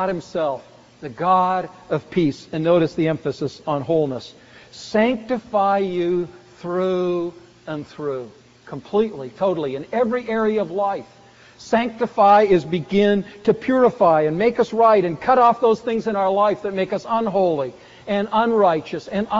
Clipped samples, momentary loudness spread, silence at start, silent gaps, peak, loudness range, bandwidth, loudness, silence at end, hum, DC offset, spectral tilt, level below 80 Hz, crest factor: under 0.1%; 15 LU; 0 s; none; -4 dBFS; 7 LU; 7.6 kHz; -20 LUFS; 0 s; none; under 0.1%; -5 dB/octave; -56 dBFS; 16 dB